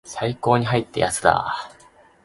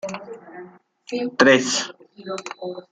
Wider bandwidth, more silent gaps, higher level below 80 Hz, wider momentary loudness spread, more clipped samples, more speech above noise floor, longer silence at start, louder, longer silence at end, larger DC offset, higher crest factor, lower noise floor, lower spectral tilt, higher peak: first, 11.5 kHz vs 9.6 kHz; neither; first, -50 dBFS vs -66 dBFS; second, 10 LU vs 24 LU; neither; first, 31 dB vs 23 dB; about the same, 0.05 s vs 0.05 s; about the same, -21 LUFS vs -20 LUFS; first, 0.55 s vs 0.1 s; neither; about the same, 22 dB vs 22 dB; first, -52 dBFS vs -44 dBFS; first, -4.5 dB/octave vs -3 dB/octave; about the same, 0 dBFS vs -2 dBFS